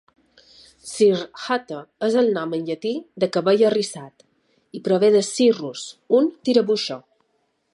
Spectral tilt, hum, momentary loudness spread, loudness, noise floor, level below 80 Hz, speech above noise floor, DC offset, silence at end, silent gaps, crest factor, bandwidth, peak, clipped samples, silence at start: -4.5 dB/octave; none; 17 LU; -21 LUFS; -69 dBFS; -72 dBFS; 49 dB; under 0.1%; 0.75 s; none; 18 dB; 11.5 kHz; -4 dBFS; under 0.1%; 0.85 s